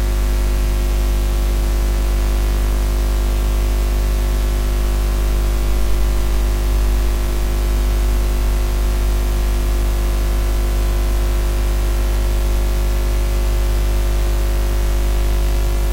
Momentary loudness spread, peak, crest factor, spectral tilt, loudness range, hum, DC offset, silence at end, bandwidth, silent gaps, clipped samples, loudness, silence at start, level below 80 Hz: 1 LU; -6 dBFS; 10 dB; -5.5 dB/octave; 0 LU; 50 Hz at -15 dBFS; under 0.1%; 0 s; 16 kHz; none; under 0.1%; -20 LUFS; 0 s; -16 dBFS